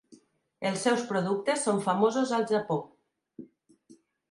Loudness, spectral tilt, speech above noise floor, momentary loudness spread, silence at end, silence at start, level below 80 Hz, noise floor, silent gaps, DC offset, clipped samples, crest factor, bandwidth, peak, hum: -28 LUFS; -4.5 dB/octave; 33 dB; 7 LU; 0.35 s; 0.1 s; -78 dBFS; -60 dBFS; none; under 0.1%; under 0.1%; 18 dB; 11.5 kHz; -12 dBFS; none